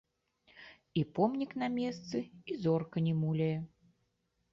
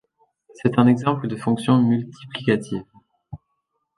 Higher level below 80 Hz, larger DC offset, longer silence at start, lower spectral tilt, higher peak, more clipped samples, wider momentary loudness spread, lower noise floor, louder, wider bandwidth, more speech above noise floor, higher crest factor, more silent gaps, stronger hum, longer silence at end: second, -70 dBFS vs -58 dBFS; neither; about the same, 0.55 s vs 0.6 s; about the same, -8 dB/octave vs -7.5 dB/octave; second, -16 dBFS vs -2 dBFS; neither; second, 16 LU vs 25 LU; first, -79 dBFS vs -74 dBFS; second, -35 LUFS vs -21 LUFS; second, 7.2 kHz vs 11.5 kHz; second, 46 dB vs 55 dB; about the same, 20 dB vs 20 dB; neither; neither; first, 0.85 s vs 0.6 s